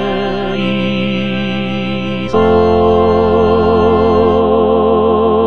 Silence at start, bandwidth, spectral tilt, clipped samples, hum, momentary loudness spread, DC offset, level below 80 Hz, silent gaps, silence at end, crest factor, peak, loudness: 0 s; 6.6 kHz; -8 dB/octave; under 0.1%; none; 7 LU; 3%; -34 dBFS; none; 0 s; 12 dB; 0 dBFS; -12 LUFS